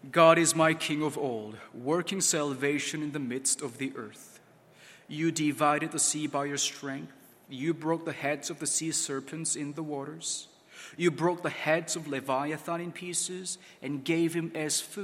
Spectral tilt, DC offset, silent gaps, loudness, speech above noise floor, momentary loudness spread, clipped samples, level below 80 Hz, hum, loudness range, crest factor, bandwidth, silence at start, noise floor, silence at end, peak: -3.5 dB/octave; under 0.1%; none; -29 LUFS; 27 dB; 12 LU; under 0.1%; -78 dBFS; none; 3 LU; 24 dB; 16.5 kHz; 0.05 s; -57 dBFS; 0 s; -6 dBFS